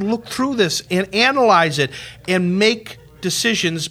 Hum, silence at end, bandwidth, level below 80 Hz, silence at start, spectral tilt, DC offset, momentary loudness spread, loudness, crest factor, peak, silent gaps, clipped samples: none; 0 s; 16 kHz; -54 dBFS; 0 s; -4 dB/octave; under 0.1%; 11 LU; -17 LUFS; 16 dB; -2 dBFS; none; under 0.1%